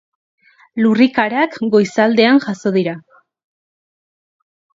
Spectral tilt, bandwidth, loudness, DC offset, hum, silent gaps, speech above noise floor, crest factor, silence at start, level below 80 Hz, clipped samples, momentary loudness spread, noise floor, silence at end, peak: -6 dB/octave; 7.8 kHz; -15 LUFS; under 0.1%; none; none; over 76 dB; 18 dB; 0.75 s; -64 dBFS; under 0.1%; 9 LU; under -90 dBFS; 1.8 s; 0 dBFS